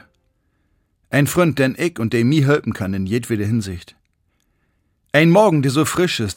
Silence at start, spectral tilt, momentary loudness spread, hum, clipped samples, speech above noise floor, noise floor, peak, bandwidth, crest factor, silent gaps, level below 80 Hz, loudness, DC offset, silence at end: 1.1 s; -6 dB/octave; 10 LU; none; under 0.1%; 49 dB; -66 dBFS; 0 dBFS; 17 kHz; 18 dB; none; -54 dBFS; -17 LUFS; under 0.1%; 0.05 s